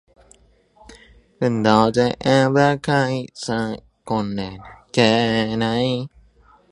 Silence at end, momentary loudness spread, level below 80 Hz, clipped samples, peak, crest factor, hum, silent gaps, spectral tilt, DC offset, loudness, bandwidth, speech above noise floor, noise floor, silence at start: 0.65 s; 13 LU; -50 dBFS; under 0.1%; 0 dBFS; 20 dB; none; none; -6 dB/octave; under 0.1%; -19 LUFS; 11 kHz; 36 dB; -54 dBFS; 0.9 s